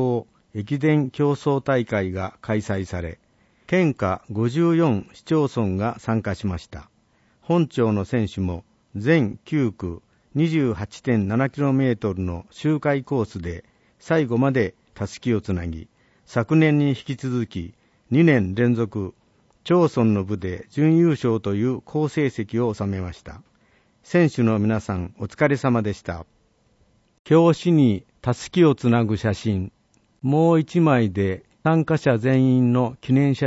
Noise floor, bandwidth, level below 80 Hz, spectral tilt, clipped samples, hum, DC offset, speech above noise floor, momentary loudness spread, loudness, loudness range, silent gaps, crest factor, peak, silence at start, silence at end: -62 dBFS; 8 kHz; -50 dBFS; -8 dB/octave; under 0.1%; none; under 0.1%; 41 dB; 13 LU; -22 LUFS; 4 LU; 27.19-27.25 s; 16 dB; -4 dBFS; 0 s; 0 s